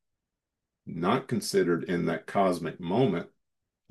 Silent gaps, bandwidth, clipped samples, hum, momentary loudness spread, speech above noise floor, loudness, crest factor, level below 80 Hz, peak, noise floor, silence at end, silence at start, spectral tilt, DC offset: none; 12.5 kHz; under 0.1%; none; 8 LU; 59 dB; -28 LUFS; 20 dB; -68 dBFS; -10 dBFS; -87 dBFS; 0.65 s; 0.85 s; -6 dB/octave; under 0.1%